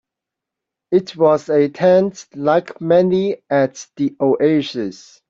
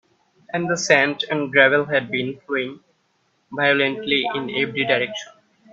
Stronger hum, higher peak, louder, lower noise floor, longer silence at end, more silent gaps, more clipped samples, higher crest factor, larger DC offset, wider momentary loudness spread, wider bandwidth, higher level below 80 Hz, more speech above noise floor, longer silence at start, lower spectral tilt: neither; about the same, -2 dBFS vs 0 dBFS; first, -17 LUFS vs -20 LUFS; first, -84 dBFS vs -66 dBFS; about the same, 0.4 s vs 0.5 s; neither; neither; second, 14 dB vs 22 dB; neither; about the same, 9 LU vs 11 LU; about the same, 7.6 kHz vs 8 kHz; first, -60 dBFS vs -66 dBFS; first, 67 dB vs 46 dB; first, 0.9 s vs 0.5 s; first, -6.5 dB/octave vs -3.5 dB/octave